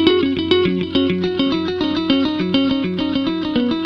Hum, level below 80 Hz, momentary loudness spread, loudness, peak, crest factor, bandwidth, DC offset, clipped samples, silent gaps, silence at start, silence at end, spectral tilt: none; -46 dBFS; 3 LU; -18 LUFS; 0 dBFS; 18 dB; 6.4 kHz; under 0.1%; under 0.1%; none; 0 s; 0 s; -7 dB/octave